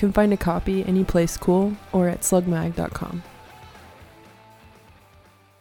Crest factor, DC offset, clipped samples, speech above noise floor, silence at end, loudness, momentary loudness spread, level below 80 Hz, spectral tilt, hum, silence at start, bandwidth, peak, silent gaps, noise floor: 18 dB; under 0.1%; under 0.1%; 32 dB; 1.55 s; -22 LUFS; 11 LU; -40 dBFS; -6 dB/octave; none; 0 s; 18 kHz; -6 dBFS; none; -53 dBFS